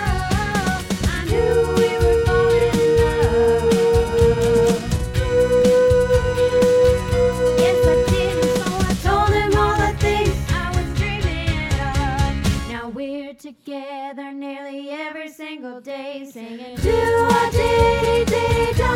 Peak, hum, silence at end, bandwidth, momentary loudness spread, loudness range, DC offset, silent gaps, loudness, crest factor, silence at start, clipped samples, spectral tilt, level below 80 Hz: -4 dBFS; none; 0 s; 16.5 kHz; 16 LU; 11 LU; under 0.1%; none; -18 LUFS; 14 dB; 0 s; under 0.1%; -5.5 dB/octave; -28 dBFS